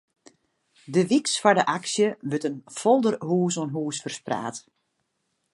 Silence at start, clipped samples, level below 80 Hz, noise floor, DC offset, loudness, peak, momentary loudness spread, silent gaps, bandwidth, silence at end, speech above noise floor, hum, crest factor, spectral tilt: 0.9 s; under 0.1%; -74 dBFS; -76 dBFS; under 0.1%; -24 LUFS; -2 dBFS; 10 LU; none; 11.5 kHz; 0.95 s; 52 dB; none; 22 dB; -4.5 dB/octave